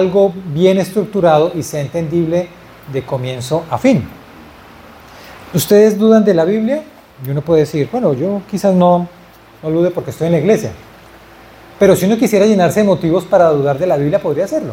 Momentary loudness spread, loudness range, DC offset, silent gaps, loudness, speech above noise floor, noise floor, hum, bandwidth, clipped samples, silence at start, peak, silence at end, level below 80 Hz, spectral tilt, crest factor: 11 LU; 5 LU; under 0.1%; none; -14 LUFS; 27 dB; -39 dBFS; none; 17 kHz; under 0.1%; 0 s; 0 dBFS; 0 s; -48 dBFS; -6.5 dB/octave; 14 dB